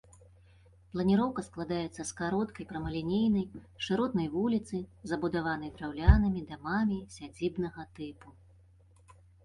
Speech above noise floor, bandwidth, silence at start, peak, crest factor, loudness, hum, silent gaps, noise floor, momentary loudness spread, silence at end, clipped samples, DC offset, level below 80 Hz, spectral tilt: 29 dB; 11 kHz; 0.95 s; -6 dBFS; 26 dB; -32 LUFS; none; none; -60 dBFS; 12 LU; 1.15 s; under 0.1%; under 0.1%; -40 dBFS; -6.5 dB/octave